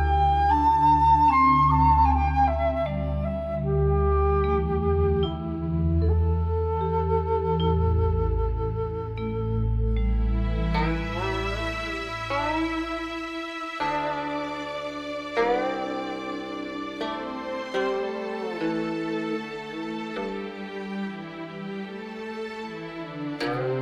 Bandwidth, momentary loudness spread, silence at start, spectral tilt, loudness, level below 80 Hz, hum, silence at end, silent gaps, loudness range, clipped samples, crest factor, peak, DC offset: 8.2 kHz; 14 LU; 0 s; -7.5 dB/octave; -26 LUFS; -32 dBFS; none; 0 s; none; 10 LU; under 0.1%; 16 dB; -10 dBFS; under 0.1%